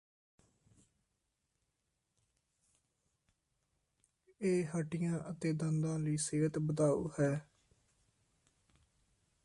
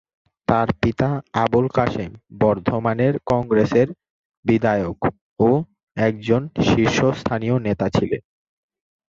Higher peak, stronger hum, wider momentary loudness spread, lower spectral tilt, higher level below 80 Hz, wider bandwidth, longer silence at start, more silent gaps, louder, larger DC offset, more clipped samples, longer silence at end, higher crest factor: second, -22 dBFS vs -4 dBFS; neither; second, 5 LU vs 8 LU; about the same, -6.5 dB/octave vs -7 dB/octave; second, -70 dBFS vs -44 dBFS; first, 11.5 kHz vs 7.6 kHz; first, 4.4 s vs 0.5 s; second, none vs 4.10-4.30 s, 4.37-4.43 s, 5.21-5.36 s, 5.83-5.87 s; second, -36 LUFS vs -20 LUFS; neither; neither; first, 2 s vs 0.9 s; about the same, 18 dB vs 18 dB